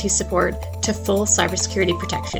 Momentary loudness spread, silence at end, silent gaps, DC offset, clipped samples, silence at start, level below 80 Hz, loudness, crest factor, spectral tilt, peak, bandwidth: 7 LU; 0 s; none; under 0.1%; under 0.1%; 0 s; -36 dBFS; -20 LUFS; 16 dB; -3 dB/octave; -4 dBFS; 19 kHz